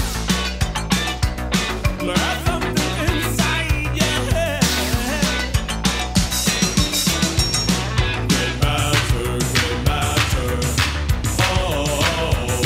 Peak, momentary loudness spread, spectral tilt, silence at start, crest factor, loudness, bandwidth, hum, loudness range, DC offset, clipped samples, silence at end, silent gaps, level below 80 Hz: -2 dBFS; 4 LU; -4 dB/octave; 0 s; 16 dB; -19 LUFS; 16.5 kHz; none; 2 LU; under 0.1%; under 0.1%; 0 s; none; -26 dBFS